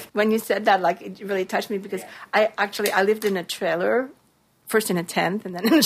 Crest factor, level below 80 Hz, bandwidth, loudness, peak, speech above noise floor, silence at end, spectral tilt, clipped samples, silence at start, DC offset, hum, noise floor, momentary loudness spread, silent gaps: 18 dB; -70 dBFS; 15.5 kHz; -23 LUFS; -6 dBFS; 27 dB; 0 s; -4 dB/octave; under 0.1%; 0 s; under 0.1%; none; -49 dBFS; 9 LU; none